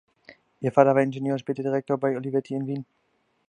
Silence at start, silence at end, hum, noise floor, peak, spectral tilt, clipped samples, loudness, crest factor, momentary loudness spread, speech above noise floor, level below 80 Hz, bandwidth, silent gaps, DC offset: 0.3 s; 0.65 s; none; -54 dBFS; -2 dBFS; -8.5 dB/octave; under 0.1%; -25 LUFS; 24 dB; 12 LU; 30 dB; -72 dBFS; 9.4 kHz; none; under 0.1%